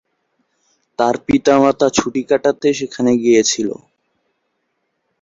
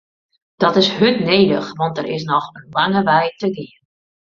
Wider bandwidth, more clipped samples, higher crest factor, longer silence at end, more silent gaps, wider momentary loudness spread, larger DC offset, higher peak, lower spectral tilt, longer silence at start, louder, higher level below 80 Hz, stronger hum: about the same, 7.8 kHz vs 7.4 kHz; neither; about the same, 16 dB vs 18 dB; first, 1.45 s vs 0.65 s; neither; about the same, 8 LU vs 10 LU; neither; about the same, 0 dBFS vs 0 dBFS; second, -4 dB/octave vs -6 dB/octave; first, 1 s vs 0.6 s; about the same, -15 LUFS vs -17 LUFS; first, -50 dBFS vs -58 dBFS; neither